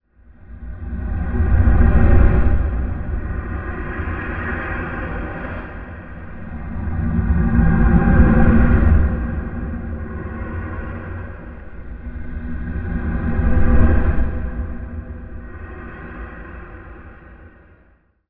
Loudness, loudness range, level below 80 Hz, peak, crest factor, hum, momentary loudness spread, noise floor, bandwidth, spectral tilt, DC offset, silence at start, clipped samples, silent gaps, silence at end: -20 LUFS; 13 LU; -20 dBFS; 0 dBFS; 18 dB; none; 20 LU; -55 dBFS; 3.5 kHz; -12.5 dB/octave; under 0.1%; 0.4 s; under 0.1%; none; 0.8 s